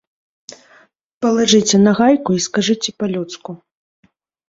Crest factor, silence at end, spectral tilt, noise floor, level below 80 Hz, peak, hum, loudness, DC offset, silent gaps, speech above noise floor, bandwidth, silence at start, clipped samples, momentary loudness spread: 18 dB; 0.95 s; -4 dB/octave; -52 dBFS; -58 dBFS; 0 dBFS; none; -15 LUFS; under 0.1%; none; 37 dB; 7.8 kHz; 1.2 s; under 0.1%; 18 LU